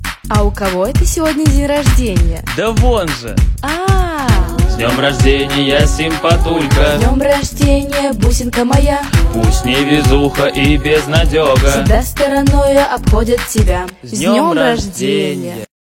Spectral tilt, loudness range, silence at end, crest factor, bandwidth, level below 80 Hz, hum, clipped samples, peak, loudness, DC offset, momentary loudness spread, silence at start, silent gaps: -5.5 dB/octave; 2 LU; 0.2 s; 12 dB; 17 kHz; -16 dBFS; none; under 0.1%; 0 dBFS; -13 LUFS; under 0.1%; 5 LU; 0 s; none